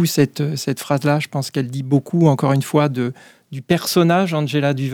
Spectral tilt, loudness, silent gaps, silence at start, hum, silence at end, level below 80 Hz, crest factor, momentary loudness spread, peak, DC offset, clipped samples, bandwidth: -6 dB/octave; -18 LUFS; none; 0 s; none; 0 s; -60 dBFS; 14 dB; 8 LU; -4 dBFS; under 0.1%; under 0.1%; 19 kHz